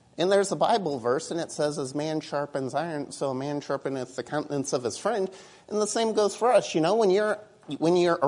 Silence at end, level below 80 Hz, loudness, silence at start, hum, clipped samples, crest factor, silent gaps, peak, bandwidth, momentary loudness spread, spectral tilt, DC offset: 0 s; -72 dBFS; -27 LUFS; 0.2 s; none; under 0.1%; 18 dB; none; -8 dBFS; 11 kHz; 10 LU; -4.5 dB/octave; under 0.1%